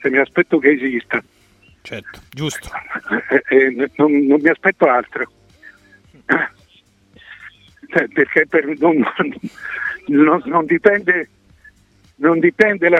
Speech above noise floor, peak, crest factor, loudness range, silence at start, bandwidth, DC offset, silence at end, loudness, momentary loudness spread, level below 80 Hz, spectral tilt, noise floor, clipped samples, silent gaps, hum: 38 dB; 0 dBFS; 18 dB; 4 LU; 0 s; 12 kHz; under 0.1%; 0 s; -16 LUFS; 15 LU; -56 dBFS; -6 dB/octave; -53 dBFS; under 0.1%; none; none